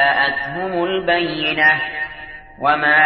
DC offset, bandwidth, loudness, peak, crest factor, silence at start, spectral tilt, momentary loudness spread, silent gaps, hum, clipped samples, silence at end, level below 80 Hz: under 0.1%; 5.8 kHz; -17 LUFS; -4 dBFS; 14 dB; 0 s; -8 dB/octave; 13 LU; none; none; under 0.1%; 0 s; -48 dBFS